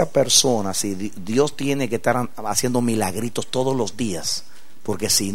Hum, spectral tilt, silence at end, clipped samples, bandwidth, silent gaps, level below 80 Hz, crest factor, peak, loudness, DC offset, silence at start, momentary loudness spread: none; -3.5 dB/octave; 0 s; under 0.1%; 16 kHz; none; -54 dBFS; 20 dB; -2 dBFS; -21 LUFS; 3%; 0 s; 11 LU